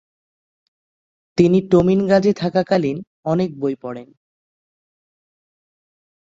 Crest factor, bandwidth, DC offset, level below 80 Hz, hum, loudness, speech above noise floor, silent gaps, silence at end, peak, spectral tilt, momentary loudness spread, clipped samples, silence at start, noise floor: 18 dB; 7.8 kHz; under 0.1%; -52 dBFS; none; -18 LUFS; over 73 dB; 3.07-3.23 s; 2.3 s; -2 dBFS; -8 dB/octave; 13 LU; under 0.1%; 1.35 s; under -90 dBFS